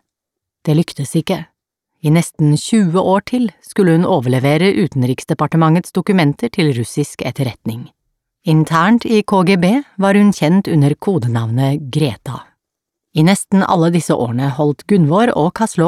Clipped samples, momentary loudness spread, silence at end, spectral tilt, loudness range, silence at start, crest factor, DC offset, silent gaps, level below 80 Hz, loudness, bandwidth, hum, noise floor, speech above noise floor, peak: under 0.1%; 9 LU; 0 s; -6.5 dB/octave; 3 LU; 0.65 s; 14 dB; under 0.1%; none; -54 dBFS; -14 LUFS; 14 kHz; none; -81 dBFS; 67 dB; 0 dBFS